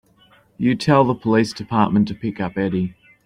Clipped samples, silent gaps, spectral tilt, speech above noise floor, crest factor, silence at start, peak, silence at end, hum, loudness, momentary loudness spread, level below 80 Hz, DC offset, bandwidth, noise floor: under 0.1%; none; -7 dB/octave; 36 dB; 18 dB; 0.6 s; -2 dBFS; 0.35 s; none; -20 LUFS; 9 LU; -52 dBFS; under 0.1%; 10.5 kHz; -54 dBFS